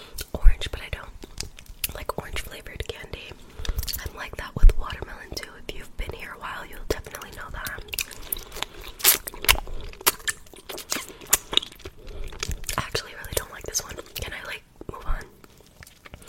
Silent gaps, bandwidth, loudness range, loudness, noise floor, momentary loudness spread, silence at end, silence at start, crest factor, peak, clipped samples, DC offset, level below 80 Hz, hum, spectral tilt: none; 16.5 kHz; 10 LU; -28 LUFS; -51 dBFS; 18 LU; 0 s; 0 s; 26 dB; 0 dBFS; under 0.1%; under 0.1%; -28 dBFS; none; -2 dB/octave